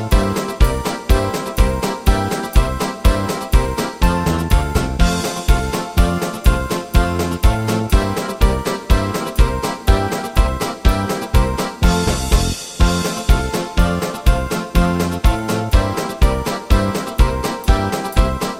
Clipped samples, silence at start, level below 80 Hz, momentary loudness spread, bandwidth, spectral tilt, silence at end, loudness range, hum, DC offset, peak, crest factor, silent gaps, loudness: under 0.1%; 0 s; -18 dBFS; 3 LU; 16.5 kHz; -5.5 dB/octave; 0 s; 1 LU; none; under 0.1%; 0 dBFS; 16 dB; none; -18 LUFS